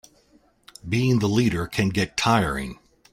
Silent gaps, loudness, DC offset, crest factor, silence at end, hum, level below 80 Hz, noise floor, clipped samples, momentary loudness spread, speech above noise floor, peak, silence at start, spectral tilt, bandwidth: none; -23 LUFS; under 0.1%; 18 dB; 0.4 s; none; -46 dBFS; -60 dBFS; under 0.1%; 10 LU; 38 dB; -6 dBFS; 0.85 s; -5.5 dB/octave; 16 kHz